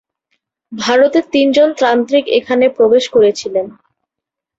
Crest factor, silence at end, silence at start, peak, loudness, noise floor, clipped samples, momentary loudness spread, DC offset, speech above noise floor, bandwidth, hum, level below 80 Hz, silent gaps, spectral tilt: 12 dB; 0.9 s; 0.7 s; -2 dBFS; -12 LUFS; -82 dBFS; under 0.1%; 10 LU; under 0.1%; 70 dB; 8 kHz; none; -60 dBFS; none; -4 dB/octave